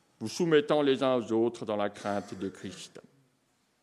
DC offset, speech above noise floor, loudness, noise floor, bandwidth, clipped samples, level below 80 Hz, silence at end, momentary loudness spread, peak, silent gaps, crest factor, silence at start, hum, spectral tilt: under 0.1%; 43 dB; -29 LUFS; -72 dBFS; 13 kHz; under 0.1%; -78 dBFS; 0.85 s; 17 LU; -10 dBFS; none; 20 dB; 0.2 s; none; -5.5 dB/octave